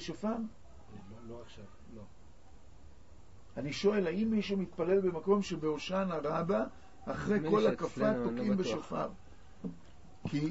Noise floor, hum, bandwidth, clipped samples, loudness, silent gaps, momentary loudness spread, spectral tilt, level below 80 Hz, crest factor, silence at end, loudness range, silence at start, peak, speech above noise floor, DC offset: -58 dBFS; none; 7.6 kHz; under 0.1%; -33 LUFS; none; 21 LU; -6 dB/octave; -60 dBFS; 18 dB; 0 s; 13 LU; 0 s; -16 dBFS; 25 dB; 0.3%